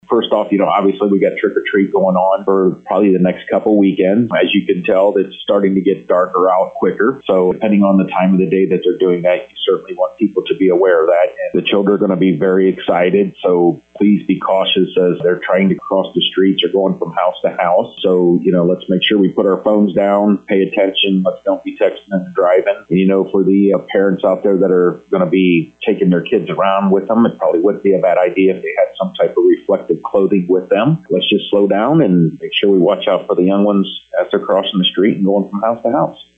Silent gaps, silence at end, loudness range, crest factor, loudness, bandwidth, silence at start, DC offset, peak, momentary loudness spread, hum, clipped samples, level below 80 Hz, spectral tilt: none; 0.15 s; 1 LU; 10 dB; -14 LUFS; 3.9 kHz; 0.1 s; under 0.1%; -2 dBFS; 5 LU; none; under 0.1%; -58 dBFS; -9 dB/octave